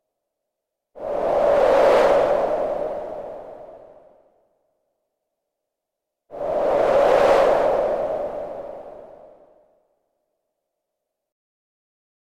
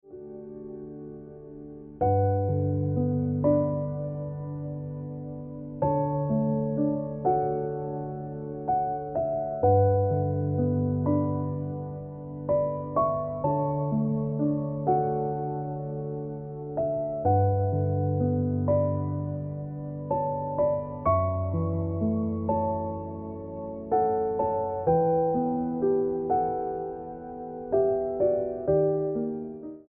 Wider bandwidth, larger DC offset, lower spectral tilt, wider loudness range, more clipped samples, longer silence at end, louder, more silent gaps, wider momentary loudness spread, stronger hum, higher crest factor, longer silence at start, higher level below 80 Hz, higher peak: first, 12.5 kHz vs 2.4 kHz; neither; second, -5 dB/octave vs -13.5 dB/octave; first, 16 LU vs 3 LU; neither; first, 3.25 s vs 0.05 s; first, -19 LUFS vs -28 LUFS; neither; first, 21 LU vs 13 LU; neither; about the same, 18 dB vs 16 dB; first, 0.95 s vs 0.05 s; about the same, -52 dBFS vs -54 dBFS; first, -6 dBFS vs -12 dBFS